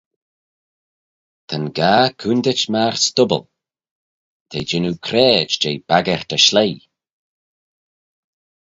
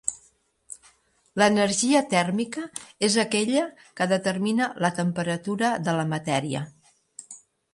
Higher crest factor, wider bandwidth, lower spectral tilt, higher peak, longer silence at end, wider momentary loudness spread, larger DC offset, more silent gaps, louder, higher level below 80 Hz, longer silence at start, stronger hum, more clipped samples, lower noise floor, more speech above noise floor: about the same, 20 dB vs 20 dB; second, 8 kHz vs 11.5 kHz; about the same, -3.5 dB/octave vs -4 dB/octave; first, 0 dBFS vs -6 dBFS; first, 1.85 s vs 0.35 s; second, 12 LU vs 22 LU; neither; first, 3.91-4.46 s vs none; first, -16 LUFS vs -24 LUFS; first, -56 dBFS vs -66 dBFS; first, 1.5 s vs 0.05 s; neither; neither; first, under -90 dBFS vs -63 dBFS; first, over 73 dB vs 38 dB